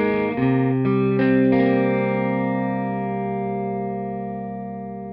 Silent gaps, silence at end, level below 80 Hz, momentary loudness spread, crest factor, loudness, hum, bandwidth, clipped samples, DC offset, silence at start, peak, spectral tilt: none; 0 s; -52 dBFS; 12 LU; 14 dB; -22 LUFS; none; 5.2 kHz; under 0.1%; under 0.1%; 0 s; -8 dBFS; -11 dB/octave